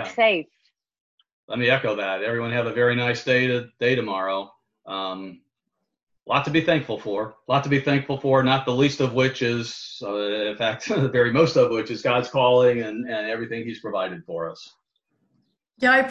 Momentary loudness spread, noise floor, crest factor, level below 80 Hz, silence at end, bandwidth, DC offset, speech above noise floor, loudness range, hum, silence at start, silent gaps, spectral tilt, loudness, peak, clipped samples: 12 LU; -80 dBFS; 18 dB; -62 dBFS; 0 s; 8.2 kHz; under 0.1%; 58 dB; 5 LU; none; 0 s; 1.00-1.18 s, 1.33-1.48 s, 6.03-6.07 s; -6 dB/octave; -22 LUFS; -6 dBFS; under 0.1%